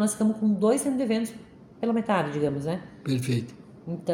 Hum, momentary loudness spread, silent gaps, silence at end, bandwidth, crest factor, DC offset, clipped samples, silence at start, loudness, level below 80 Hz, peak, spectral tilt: none; 12 LU; none; 0 s; 16.5 kHz; 16 dB; under 0.1%; under 0.1%; 0 s; -27 LUFS; -62 dBFS; -10 dBFS; -6 dB/octave